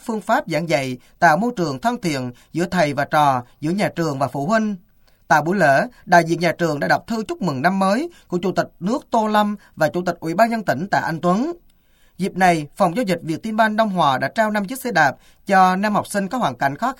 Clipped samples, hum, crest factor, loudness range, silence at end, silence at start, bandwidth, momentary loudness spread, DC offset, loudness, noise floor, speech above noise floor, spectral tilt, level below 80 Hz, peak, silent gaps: under 0.1%; none; 20 dB; 2 LU; 0.05 s; 0.05 s; 17 kHz; 8 LU; under 0.1%; -19 LUFS; -55 dBFS; 36 dB; -5.5 dB/octave; -54 dBFS; 0 dBFS; none